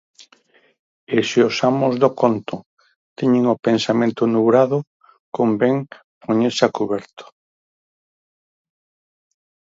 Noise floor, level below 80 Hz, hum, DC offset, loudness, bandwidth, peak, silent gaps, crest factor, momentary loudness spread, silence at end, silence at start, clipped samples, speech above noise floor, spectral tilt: -56 dBFS; -66 dBFS; none; under 0.1%; -18 LUFS; 7.8 kHz; 0 dBFS; 0.79-1.07 s, 2.66-2.77 s, 2.96-3.16 s, 4.87-5.00 s, 5.19-5.32 s, 6.04-6.21 s, 7.13-7.17 s; 20 dB; 10 LU; 2.5 s; 0.2 s; under 0.1%; 38 dB; -6 dB/octave